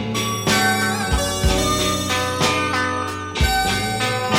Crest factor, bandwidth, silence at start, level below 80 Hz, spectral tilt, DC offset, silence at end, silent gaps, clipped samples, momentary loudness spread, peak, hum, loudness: 16 dB; 16.5 kHz; 0 s; -30 dBFS; -3.5 dB/octave; under 0.1%; 0 s; none; under 0.1%; 4 LU; -4 dBFS; none; -19 LUFS